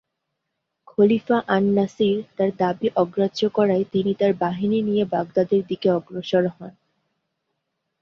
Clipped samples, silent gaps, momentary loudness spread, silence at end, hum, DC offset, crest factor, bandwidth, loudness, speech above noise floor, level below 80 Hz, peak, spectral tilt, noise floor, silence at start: under 0.1%; none; 4 LU; 1.3 s; none; under 0.1%; 18 dB; 7 kHz; -21 LUFS; 58 dB; -64 dBFS; -4 dBFS; -7.5 dB/octave; -79 dBFS; 1 s